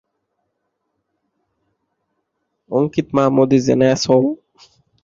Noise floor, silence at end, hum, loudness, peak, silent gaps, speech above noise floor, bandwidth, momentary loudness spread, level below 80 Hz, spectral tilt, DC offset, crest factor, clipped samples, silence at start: -73 dBFS; 0.7 s; none; -16 LUFS; -2 dBFS; none; 58 dB; 7.6 kHz; 9 LU; -56 dBFS; -6 dB/octave; under 0.1%; 18 dB; under 0.1%; 2.7 s